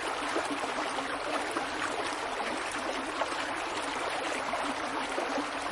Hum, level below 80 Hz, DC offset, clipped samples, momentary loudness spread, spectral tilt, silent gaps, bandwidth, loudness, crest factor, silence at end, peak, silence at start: none; -62 dBFS; under 0.1%; under 0.1%; 1 LU; -2 dB/octave; none; 11.5 kHz; -33 LUFS; 16 dB; 0 s; -18 dBFS; 0 s